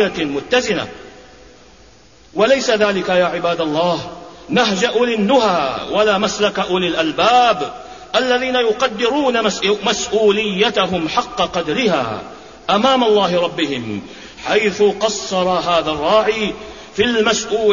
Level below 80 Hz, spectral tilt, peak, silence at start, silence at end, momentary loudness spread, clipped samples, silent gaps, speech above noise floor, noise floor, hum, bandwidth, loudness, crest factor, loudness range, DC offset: -48 dBFS; -3.5 dB/octave; -2 dBFS; 0 s; 0 s; 11 LU; under 0.1%; none; 30 dB; -46 dBFS; none; 7.4 kHz; -16 LUFS; 14 dB; 2 LU; 0.2%